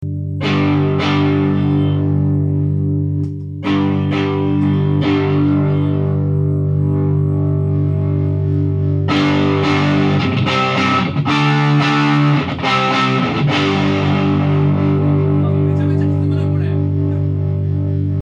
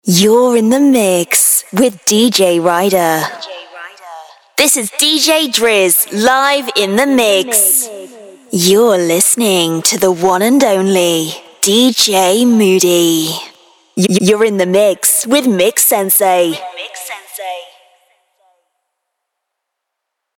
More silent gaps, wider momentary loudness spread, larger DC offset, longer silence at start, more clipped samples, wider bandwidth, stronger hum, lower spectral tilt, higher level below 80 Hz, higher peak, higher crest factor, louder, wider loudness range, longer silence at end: neither; second, 4 LU vs 15 LU; neither; about the same, 0 s vs 0.05 s; neither; second, 7.2 kHz vs 19.5 kHz; first, 50 Hz at -40 dBFS vs none; first, -7.5 dB/octave vs -3 dB/octave; first, -50 dBFS vs -60 dBFS; second, -4 dBFS vs 0 dBFS; about the same, 12 dB vs 12 dB; second, -16 LUFS vs -10 LUFS; about the same, 2 LU vs 3 LU; second, 0 s vs 2.75 s